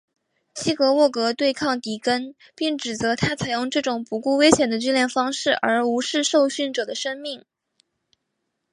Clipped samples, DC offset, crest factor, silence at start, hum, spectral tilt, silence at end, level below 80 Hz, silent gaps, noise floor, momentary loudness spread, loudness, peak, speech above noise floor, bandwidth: under 0.1%; under 0.1%; 22 dB; 0.55 s; none; -3.5 dB/octave; 1.35 s; -56 dBFS; none; -77 dBFS; 10 LU; -22 LUFS; 0 dBFS; 56 dB; 11.5 kHz